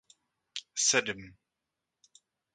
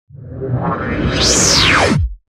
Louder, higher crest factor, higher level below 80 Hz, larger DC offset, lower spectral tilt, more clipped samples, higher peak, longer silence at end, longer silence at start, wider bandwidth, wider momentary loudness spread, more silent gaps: second, -28 LUFS vs -12 LUFS; first, 26 dB vs 14 dB; second, -72 dBFS vs -26 dBFS; neither; second, -0.5 dB/octave vs -3 dB/octave; neither; second, -10 dBFS vs 0 dBFS; first, 1.25 s vs 0.15 s; first, 0.55 s vs 0.15 s; second, 11 kHz vs 16.5 kHz; first, 17 LU vs 14 LU; neither